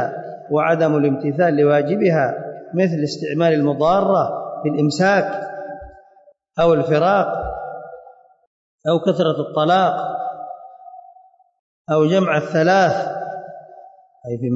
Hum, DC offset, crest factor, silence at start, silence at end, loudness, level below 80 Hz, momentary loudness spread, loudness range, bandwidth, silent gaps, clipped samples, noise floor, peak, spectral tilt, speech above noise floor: none; under 0.1%; 14 dB; 0 s; 0 s; -18 LUFS; -52 dBFS; 17 LU; 3 LU; 8 kHz; 8.47-8.78 s, 11.59-11.85 s; under 0.1%; -52 dBFS; -6 dBFS; -7 dB/octave; 36 dB